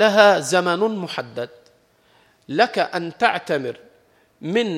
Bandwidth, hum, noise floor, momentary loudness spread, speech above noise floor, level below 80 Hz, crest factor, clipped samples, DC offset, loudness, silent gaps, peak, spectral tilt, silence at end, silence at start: 15 kHz; none; -58 dBFS; 18 LU; 38 dB; -72 dBFS; 20 dB; under 0.1%; under 0.1%; -20 LUFS; none; 0 dBFS; -4 dB/octave; 0 s; 0 s